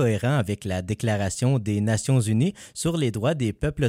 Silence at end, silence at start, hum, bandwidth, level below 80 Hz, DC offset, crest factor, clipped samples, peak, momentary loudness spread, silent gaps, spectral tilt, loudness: 0 s; 0 s; none; 15.5 kHz; -46 dBFS; under 0.1%; 14 dB; under 0.1%; -10 dBFS; 5 LU; none; -6 dB/octave; -24 LUFS